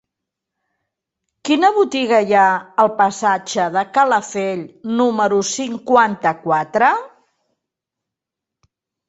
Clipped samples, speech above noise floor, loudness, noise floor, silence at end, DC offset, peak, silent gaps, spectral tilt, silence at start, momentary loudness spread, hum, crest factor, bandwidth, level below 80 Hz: under 0.1%; 68 dB; -16 LUFS; -84 dBFS; 2 s; under 0.1%; -2 dBFS; none; -4 dB/octave; 1.45 s; 9 LU; none; 16 dB; 8.2 kHz; -64 dBFS